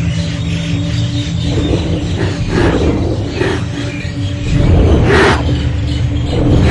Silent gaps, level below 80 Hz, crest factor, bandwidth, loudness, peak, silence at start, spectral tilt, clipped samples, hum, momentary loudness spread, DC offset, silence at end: none; -20 dBFS; 12 dB; 11 kHz; -14 LUFS; 0 dBFS; 0 s; -6.5 dB/octave; under 0.1%; none; 8 LU; under 0.1%; 0 s